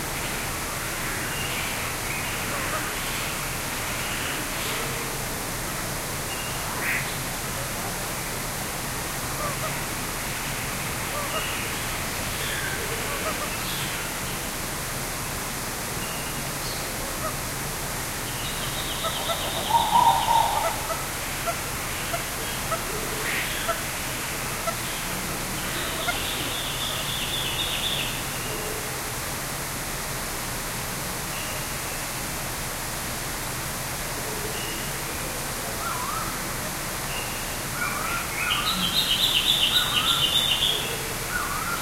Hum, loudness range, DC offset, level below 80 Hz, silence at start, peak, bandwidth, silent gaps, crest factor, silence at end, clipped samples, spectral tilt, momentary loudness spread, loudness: none; 6 LU; under 0.1%; -42 dBFS; 0 s; -6 dBFS; 16 kHz; none; 22 dB; 0 s; under 0.1%; -2 dB/octave; 8 LU; -26 LUFS